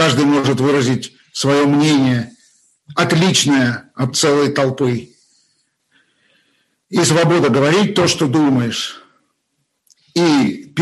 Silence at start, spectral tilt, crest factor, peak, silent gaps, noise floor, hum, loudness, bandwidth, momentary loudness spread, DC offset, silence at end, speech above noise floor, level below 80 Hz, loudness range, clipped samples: 0 s; -4.5 dB/octave; 16 dB; -2 dBFS; none; -69 dBFS; none; -15 LUFS; 12.5 kHz; 10 LU; under 0.1%; 0 s; 55 dB; -56 dBFS; 3 LU; under 0.1%